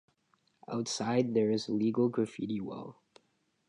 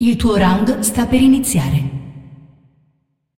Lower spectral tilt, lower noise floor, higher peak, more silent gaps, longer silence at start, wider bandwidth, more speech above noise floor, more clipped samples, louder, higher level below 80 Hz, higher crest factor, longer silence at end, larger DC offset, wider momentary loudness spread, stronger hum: about the same, -5.5 dB/octave vs -5.5 dB/octave; first, -75 dBFS vs -64 dBFS; second, -16 dBFS vs -2 dBFS; neither; first, 0.7 s vs 0 s; second, 11 kHz vs 17 kHz; second, 44 dB vs 50 dB; neither; second, -32 LUFS vs -15 LUFS; second, -74 dBFS vs -34 dBFS; about the same, 18 dB vs 14 dB; second, 0.75 s vs 0.9 s; neither; about the same, 12 LU vs 13 LU; neither